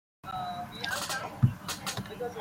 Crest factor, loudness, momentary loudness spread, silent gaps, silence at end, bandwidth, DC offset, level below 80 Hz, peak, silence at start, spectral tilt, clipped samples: 24 dB; -33 LUFS; 9 LU; none; 0 s; 16.5 kHz; under 0.1%; -58 dBFS; -10 dBFS; 0.25 s; -4.5 dB/octave; under 0.1%